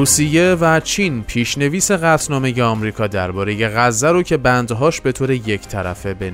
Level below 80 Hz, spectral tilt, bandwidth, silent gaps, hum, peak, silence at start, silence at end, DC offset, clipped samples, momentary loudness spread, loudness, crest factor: -38 dBFS; -4.5 dB/octave; 16 kHz; none; none; -2 dBFS; 0 s; 0 s; under 0.1%; under 0.1%; 8 LU; -16 LUFS; 14 dB